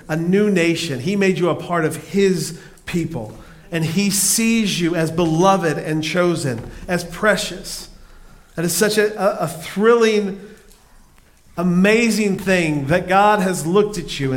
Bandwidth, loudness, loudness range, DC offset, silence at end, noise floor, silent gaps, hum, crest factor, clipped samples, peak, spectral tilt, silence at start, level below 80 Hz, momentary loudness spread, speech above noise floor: 17 kHz; -18 LUFS; 3 LU; under 0.1%; 0 s; -49 dBFS; none; none; 16 dB; under 0.1%; -2 dBFS; -4.5 dB/octave; 0.05 s; -44 dBFS; 13 LU; 31 dB